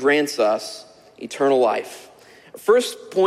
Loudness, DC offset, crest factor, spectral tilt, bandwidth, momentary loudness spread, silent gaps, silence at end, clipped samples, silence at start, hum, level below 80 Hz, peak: -20 LUFS; under 0.1%; 16 dB; -3.5 dB/octave; 15.5 kHz; 20 LU; none; 0 s; under 0.1%; 0 s; none; -70 dBFS; -6 dBFS